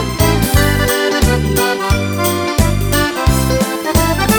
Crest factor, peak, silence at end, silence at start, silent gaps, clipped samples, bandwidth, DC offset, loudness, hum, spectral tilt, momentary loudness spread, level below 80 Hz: 14 dB; 0 dBFS; 0 s; 0 s; none; under 0.1%; over 20 kHz; under 0.1%; -14 LUFS; none; -4.5 dB/octave; 3 LU; -20 dBFS